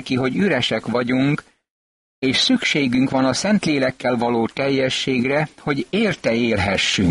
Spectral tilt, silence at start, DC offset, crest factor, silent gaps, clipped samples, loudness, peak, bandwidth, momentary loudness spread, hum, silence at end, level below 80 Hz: -4.5 dB/octave; 0 s; under 0.1%; 12 dB; 1.70-2.22 s; under 0.1%; -19 LUFS; -6 dBFS; 11.5 kHz; 4 LU; none; 0 s; -50 dBFS